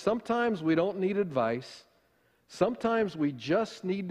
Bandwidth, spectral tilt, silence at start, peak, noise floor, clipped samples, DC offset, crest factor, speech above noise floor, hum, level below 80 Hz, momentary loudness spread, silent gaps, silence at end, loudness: 11.5 kHz; -6.5 dB/octave; 0 s; -12 dBFS; -69 dBFS; under 0.1%; under 0.1%; 18 dB; 40 dB; none; -66 dBFS; 6 LU; none; 0 s; -30 LUFS